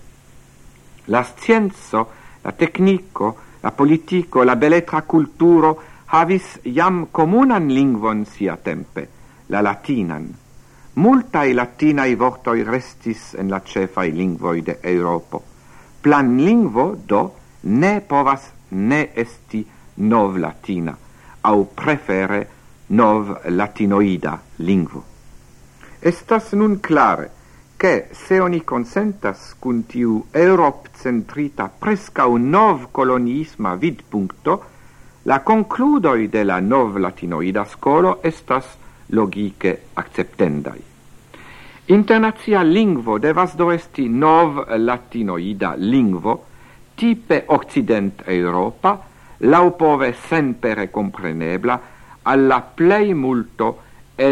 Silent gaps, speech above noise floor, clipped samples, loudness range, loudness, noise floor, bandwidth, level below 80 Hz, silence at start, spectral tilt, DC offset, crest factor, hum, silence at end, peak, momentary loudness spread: none; 28 dB; under 0.1%; 4 LU; -18 LUFS; -45 dBFS; 11.5 kHz; -50 dBFS; 0.05 s; -7.5 dB/octave; under 0.1%; 18 dB; none; 0 s; 0 dBFS; 12 LU